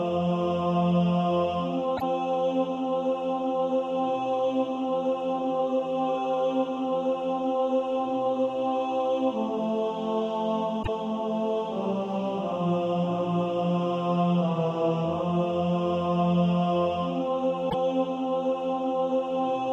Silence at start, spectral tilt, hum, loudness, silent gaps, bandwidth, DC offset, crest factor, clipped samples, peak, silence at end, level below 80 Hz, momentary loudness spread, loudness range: 0 s; -8.5 dB/octave; none; -27 LUFS; none; 7.2 kHz; under 0.1%; 12 dB; under 0.1%; -14 dBFS; 0 s; -58 dBFS; 4 LU; 2 LU